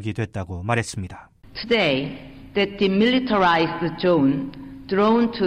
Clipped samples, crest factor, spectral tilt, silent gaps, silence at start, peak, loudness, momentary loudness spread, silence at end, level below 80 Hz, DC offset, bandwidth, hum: under 0.1%; 14 dB; -6 dB/octave; none; 0 s; -8 dBFS; -21 LUFS; 16 LU; 0 s; -50 dBFS; under 0.1%; 11.5 kHz; none